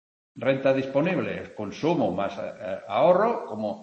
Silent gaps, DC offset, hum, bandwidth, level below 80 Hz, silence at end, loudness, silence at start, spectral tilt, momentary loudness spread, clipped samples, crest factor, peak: none; under 0.1%; none; 7.4 kHz; -66 dBFS; 0 s; -25 LUFS; 0.35 s; -7 dB/octave; 13 LU; under 0.1%; 18 dB; -8 dBFS